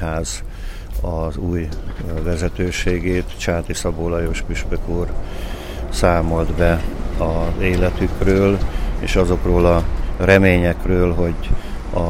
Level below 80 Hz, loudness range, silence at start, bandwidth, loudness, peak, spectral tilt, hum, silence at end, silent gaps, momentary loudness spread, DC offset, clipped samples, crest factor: -24 dBFS; 6 LU; 0 s; 16 kHz; -20 LUFS; 0 dBFS; -6 dB/octave; none; 0 s; none; 12 LU; under 0.1%; under 0.1%; 18 dB